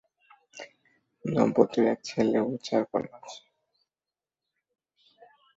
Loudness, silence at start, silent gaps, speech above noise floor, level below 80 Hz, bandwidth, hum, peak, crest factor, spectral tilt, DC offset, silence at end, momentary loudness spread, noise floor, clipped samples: -27 LUFS; 0.55 s; none; over 64 dB; -68 dBFS; 7.8 kHz; none; -6 dBFS; 24 dB; -6.5 dB/octave; under 0.1%; 2.2 s; 23 LU; under -90 dBFS; under 0.1%